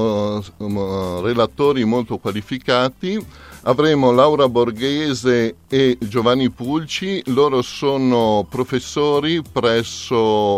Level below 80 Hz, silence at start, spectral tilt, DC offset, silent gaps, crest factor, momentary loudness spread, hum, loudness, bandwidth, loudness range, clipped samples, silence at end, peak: -50 dBFS; 0 s; -5.5 dB/octave; under 0.1%; none; 16 dB; 9 LU; none; -18 LUFS; 15.5 kHz; 3 LU; under 0.1%; 0 s; 0 dBFS